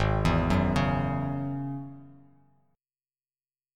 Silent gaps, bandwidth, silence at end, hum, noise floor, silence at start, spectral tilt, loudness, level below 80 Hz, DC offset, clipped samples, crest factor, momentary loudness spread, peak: none; 12 kHz; 1.65 s; none; under -90 dBFS; 0 s; -7.5 dB/octave; -28 LUFS; -40 dBFS; under 0.1%; under 0.1%; 18 dB; 12 LU; -12 dBFS